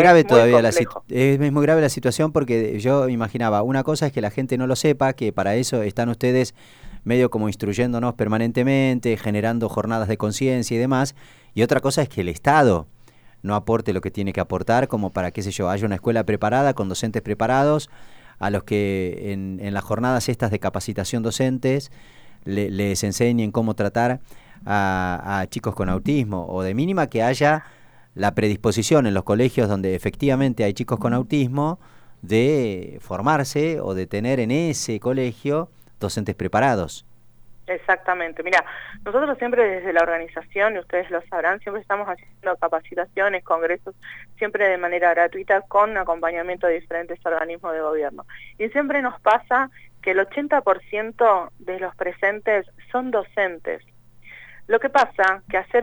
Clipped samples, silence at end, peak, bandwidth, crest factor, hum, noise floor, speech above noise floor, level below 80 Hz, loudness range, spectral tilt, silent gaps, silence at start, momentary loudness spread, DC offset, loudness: under 0.1%; 0 s; -2 dBFS; over 20 kHz; 20 dB; none; -45 dBFS; 24 dB; -48 dBFS; 3 LU; -6 dB/octave; none; 0 s; 9 LU; under 0.1%; -21 LUFS